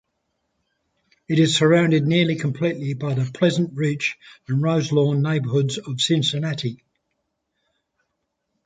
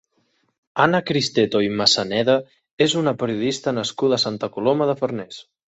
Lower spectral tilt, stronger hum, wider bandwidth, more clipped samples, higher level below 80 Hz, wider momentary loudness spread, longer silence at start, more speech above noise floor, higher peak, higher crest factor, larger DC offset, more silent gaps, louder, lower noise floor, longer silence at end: about the same, -5.5 dB/octave vs -4.5 dB/octave; neither; first, 9.4 kHz vs 8.2 kHz; neither; about the same, -64 dBFS vs -60 dBFS; about the same, 9 LU vs 7 LU; first, 1.3 s vs 0.75 s; first, 56 dB vs 47 dB; about the same, -4 dBFS vs -2 dBFS; about the same, 18 dB vs 20 dB; neither; second, none vs 2.71-2.77 s; about the same, -21 LUFS vs -20 LUFS; first, -76 dBFS vs -67 dBFS; first, 1.9 s vs 0.25 s